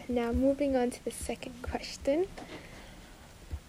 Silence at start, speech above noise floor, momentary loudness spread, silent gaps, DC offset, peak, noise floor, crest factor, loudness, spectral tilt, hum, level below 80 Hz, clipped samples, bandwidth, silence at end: 0 s; 20 dB; 22 LU; none; under 0.1%; -18 dBFS; -51 dBFS; 16 dB; -32 LUFS; -5.5 dB/octave; none; -48 dBFS; under 0.1%; 16 kHz; 0 s